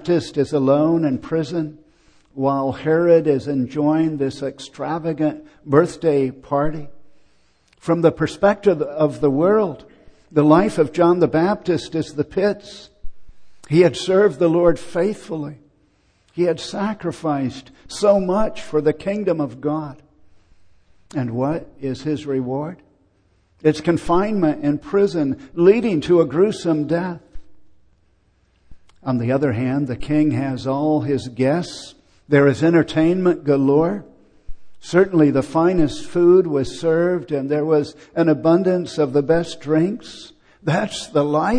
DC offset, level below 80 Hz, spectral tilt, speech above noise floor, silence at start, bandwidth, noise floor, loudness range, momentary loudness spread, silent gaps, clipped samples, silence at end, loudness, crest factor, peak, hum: under 0.1%; -46 dBFS; -7 dB/octave; 42 dB; 0 s; 10.5 kHz; -60 dBFS; 6 LU; 12 LU; none; under 0.1%; 0 s; -19 LUFS; 18 dB; 0 dBFS; none